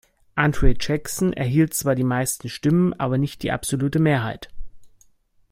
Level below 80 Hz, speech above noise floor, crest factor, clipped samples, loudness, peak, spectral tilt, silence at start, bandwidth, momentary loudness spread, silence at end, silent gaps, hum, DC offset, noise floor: -32 dBFS; 38 dB; 20 dB; under 0.1%; -22 LUFS; -2 dBFS; -5.5 dB/octave; 0.35 s; 16.5 kHz; 6 LU; 0.65 s; none; none; under 0.1%; -58 dBFS